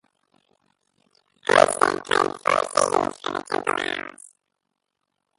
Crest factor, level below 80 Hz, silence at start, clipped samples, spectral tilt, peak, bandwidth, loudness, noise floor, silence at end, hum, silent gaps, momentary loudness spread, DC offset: 24 dB; -64 dBFS; 1.5 s; under 0.1%; -2.5 dB/octave; 0 dBFS; 11.5 kHz; -22 LUFS; -79 dBFS; 1.3 s; none; none; 13 LU; under 0.1%